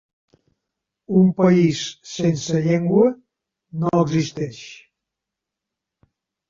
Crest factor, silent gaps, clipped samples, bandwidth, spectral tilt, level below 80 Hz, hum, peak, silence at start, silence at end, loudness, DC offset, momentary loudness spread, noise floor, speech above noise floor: 18 dB; none; under 0.1%; 7.6 kHz; -6.5 dB/octave; -58 dBFS; none; -4 dBFS; 1.1 s; 1.75 s; -19 LUFS; under 0.1%; 16 LU; -84 dBFS; 66 dB